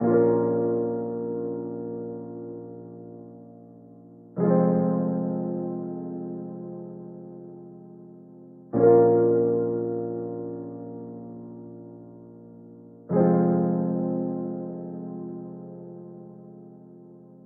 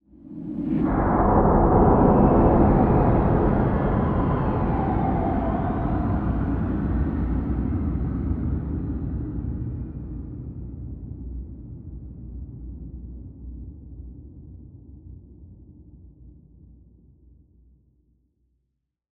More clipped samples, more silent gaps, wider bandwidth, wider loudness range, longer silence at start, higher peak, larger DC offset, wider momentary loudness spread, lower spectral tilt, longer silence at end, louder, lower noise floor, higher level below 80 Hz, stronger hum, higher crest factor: neither; neither; second, 2.3 kHz vs 4.1 kHz; second, 12 LU vs 22 LU; second, 0 s vs 0.25 s; second, -8 dBFS vs -4 dBFS; neither; about the same, 25 LU vs 23 LU; second, -8.5 dB/octave vs -12.5 dB/octave; second, 0.15 s vs 2.8 s; second, -25 LUFS vs -22 LUFS; second, -48 dBFS vs -78 dBFS; second, -68 dBFS vs -30 dBFS; neither; about the same, 20 dB vs 20 dB